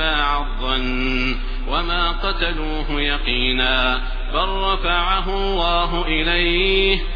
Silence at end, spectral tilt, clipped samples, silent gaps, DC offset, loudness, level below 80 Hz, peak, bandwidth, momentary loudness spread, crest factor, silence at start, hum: 0 s; -6 dB/octave; under 0.1%; none; under 0.1%; -20 LUFS; -22 dBFS; -2 dBFS; 5.2 kHz; 7 LU; 16 dB; 0 s; none